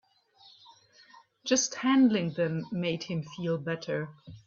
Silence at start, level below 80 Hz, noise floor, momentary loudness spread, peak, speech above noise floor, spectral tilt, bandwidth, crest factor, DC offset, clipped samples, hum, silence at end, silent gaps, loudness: 1.45 s; -70 dBFS; -60 dBFS; 12 LU; -12 dBFS; 31 dB; -4.5 dB/octave; 7.4 kHz; 20 dB; under 0.1%; under 0.1%; none; 0.1 s; none; -29 LUFS